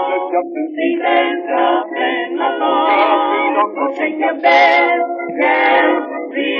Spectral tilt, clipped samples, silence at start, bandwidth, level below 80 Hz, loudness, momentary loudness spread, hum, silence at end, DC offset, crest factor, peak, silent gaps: 1 dB/octave; under 0.1%; 0 s; 6.6 kHz; under -90 dBFS; -15 LUFS; 8 LU; none; 0 s; under 0.1%; 14 dB; 0 dBFS; none